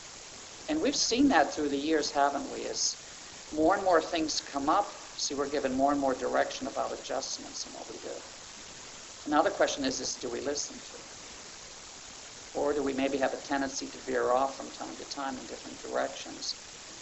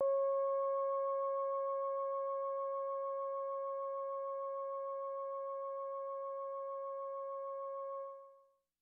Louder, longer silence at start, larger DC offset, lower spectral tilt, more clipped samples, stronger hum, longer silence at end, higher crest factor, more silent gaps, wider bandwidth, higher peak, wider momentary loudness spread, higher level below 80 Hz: first, -31 LUFS vs -40 LUFS; about the same, 0 s vs 0 s; neither; first, -2.5 dB/octave vs 0.5 dB/octave; neither; neither; second, 0 s vs 0.45 s; first, 20 dB vs 14 dB; neither; first, 8.4 kHz vs 3.4 kHz; first, -10 dBFS vs -26 dBFS; first, 17 LU vs 8 LU; first, -60 dBFS vs under -90 dBFS